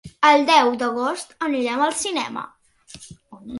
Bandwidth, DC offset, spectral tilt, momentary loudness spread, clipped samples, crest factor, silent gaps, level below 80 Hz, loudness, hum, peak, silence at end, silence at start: 11.5 kHz; under 0.1%; -2.5 dB/octave; 21 LU; under 0.1%; 18 dB; none; -60 dBFS; -19 LUFS; none; -2 dBFS; 0 s; 0.05 s